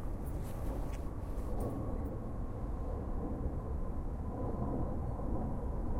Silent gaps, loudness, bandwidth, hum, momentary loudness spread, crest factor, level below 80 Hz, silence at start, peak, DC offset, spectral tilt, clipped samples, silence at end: none; -40 LUFS; 16 kHz; none; 4 LU; 12 dB; -40 dBFS; 0 s; -24 dBFS; under 0.1%; -9 dB/octave; under 0.1%; 0 s